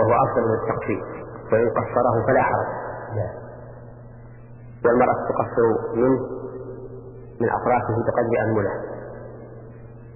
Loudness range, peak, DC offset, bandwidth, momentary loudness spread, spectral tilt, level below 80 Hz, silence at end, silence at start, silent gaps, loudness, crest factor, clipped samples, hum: 2 LU; -4 dBFS; under 0.1%; 2.9 kHz; 22 LU; -13 dB/octave; -48 dBFS; 0 s; 0 s; none; -22 LUFS; 18 dB; under 0.1%; none